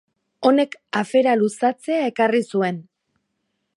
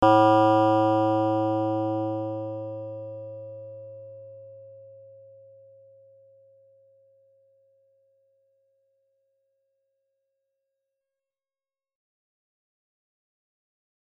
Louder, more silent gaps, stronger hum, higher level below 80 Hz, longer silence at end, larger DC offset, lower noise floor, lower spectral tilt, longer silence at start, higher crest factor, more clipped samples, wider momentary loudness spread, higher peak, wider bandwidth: first, -20 LUFS vs -23 LUFS; neither; neither; second, -76 dBFS vs -66 dBFS; second, 0.95 s vs 9.2 s; neither; second, -74 dBFS vs under -90 dBFS; second, -5.5 dB/octave vs -8.5 dB/octave; first, 0.4 s vs 0 s; about the same, 18 dB vs 22 dB; neither; second, 6 LU vs 27 LU; about the same, -4 dBFS vs -6 dBFS; first, 11.5 kHz vs 8.6 kHz